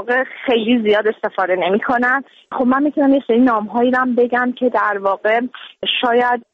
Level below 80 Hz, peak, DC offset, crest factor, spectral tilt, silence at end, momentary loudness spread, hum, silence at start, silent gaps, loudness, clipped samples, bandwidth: -60 dBFS; -4 dBFS; under 0.1%; 12 dB; -6.5 dB/octave; 0.15 s; 6 LU; none; 0 s; none; -16 LUFS; under 0.1%; 5.4 kHz